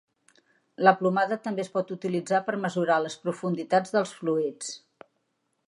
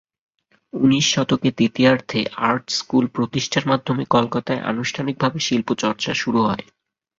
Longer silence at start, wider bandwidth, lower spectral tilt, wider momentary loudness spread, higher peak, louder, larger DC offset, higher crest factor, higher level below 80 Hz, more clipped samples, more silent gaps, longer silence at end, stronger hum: about the same, 0.8 s vs 0.75 s; first, 11.5 kHz vs 7.8 kHz; about the same, -5.5 dB/octave vs -4.5 dB/octave; first, 9 LU vs 6 LU; about the same, -4 dBFS vs -2 dBFS; second, -27 LUFS vs -20 LUFS; neither; first, 24 dB vs 18 dB; second, -80 dBFS vs -56 dBFS; neither; neither; first, 0.9 s vs 0.6 s; neither